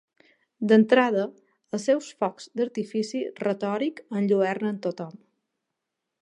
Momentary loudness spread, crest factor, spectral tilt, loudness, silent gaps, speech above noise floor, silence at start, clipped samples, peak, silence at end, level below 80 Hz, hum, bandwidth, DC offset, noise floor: 12 LU; 20 dB; -6 dB/octave; -25 LUFS; none; 59 dB; 0.6 s; under 0.1%; -6 dBFS; 1.1 s; -80 dBFS; none; 10.5 kHz; under 0.1%; -84 dBFS